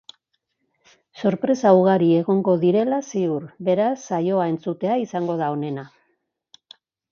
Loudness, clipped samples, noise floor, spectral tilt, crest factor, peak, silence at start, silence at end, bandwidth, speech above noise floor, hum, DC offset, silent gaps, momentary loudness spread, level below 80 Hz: -21 LUFS; under 0.1%; -74 dBFS; -7.5 dB/octave; 20 dB; -2 dBFS; 1.15 s; 1.25 s; 7.2 kHz; 54 dB; none; under 0.1%; none; 9 LU; -70 dBFS